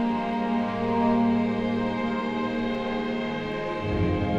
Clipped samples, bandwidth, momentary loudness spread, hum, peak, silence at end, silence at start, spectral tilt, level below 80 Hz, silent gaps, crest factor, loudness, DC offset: under 0.1%; 7.2 kHz; 6 LU; none; -12 dBFS; 0 s; 0 s; -8 dB/octave; -46 dBFS; none; 14 dB; -26 LUFS; under 0.1%